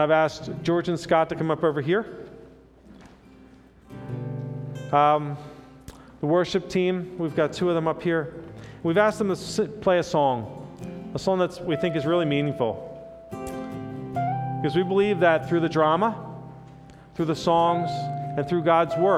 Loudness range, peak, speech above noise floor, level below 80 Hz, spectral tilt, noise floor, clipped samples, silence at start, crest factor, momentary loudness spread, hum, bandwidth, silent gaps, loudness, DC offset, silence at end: 4 LU; -6 dBFS; 28 dB; -56 dBFS; -6.5 dB/octave; -51 dBFS; under 0.1%; 0 s; 18 dB; 17 LU; none; 13 kHz; none; -24 LUFS; under 0.1%; 0 s